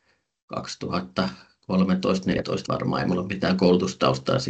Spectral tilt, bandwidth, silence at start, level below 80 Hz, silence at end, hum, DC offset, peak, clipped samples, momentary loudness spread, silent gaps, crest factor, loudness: -6 dB/octave; 8.2 kHz; 0.5 s; -54 dBFS; 0 s; none; under 0.1%; -6 dBFS; under 0.1%; 12 LU; none; 18 dB; -24 LUFS